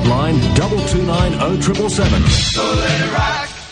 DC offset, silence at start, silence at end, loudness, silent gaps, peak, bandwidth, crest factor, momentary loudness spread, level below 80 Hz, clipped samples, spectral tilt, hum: under 0.1%; 0 s; 0 s; -15 LUFS; none; 0 dBFS; 10 kHz; 14 dB; 3 LU; -24 dBFS; under 0.1%; -5 dB/octave; none